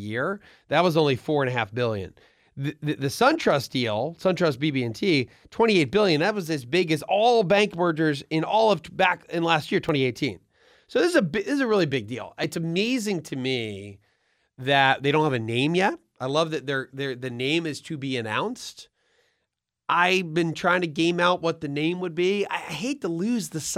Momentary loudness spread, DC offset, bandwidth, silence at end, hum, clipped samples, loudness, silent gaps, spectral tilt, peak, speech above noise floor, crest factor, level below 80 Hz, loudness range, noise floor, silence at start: 10 LU; under 0.1%; 16 kHz; 0 s; none; under 0.1%; -24 LUFS; none; -5 dB/octave; -4 dBFS; 57 dB; 20 dB; -62 dBFS; 5 LU; -81 dBFS; 0 s